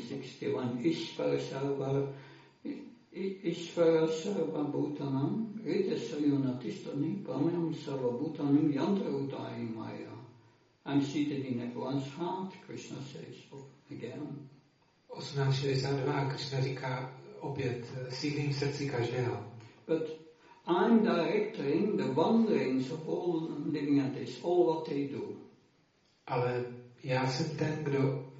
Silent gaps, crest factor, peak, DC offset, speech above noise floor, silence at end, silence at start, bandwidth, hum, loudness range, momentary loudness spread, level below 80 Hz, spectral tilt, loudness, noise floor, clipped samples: none; 18 dB; -14 dBFS; under 0.1%; 37 dB; 0 s; 0 s; 7.6 kHz; none; 7 LU; 16 LU; -74 dBFS; -6.5 dB/octave; -33 LUFS; -70 dBFS; under 0.1%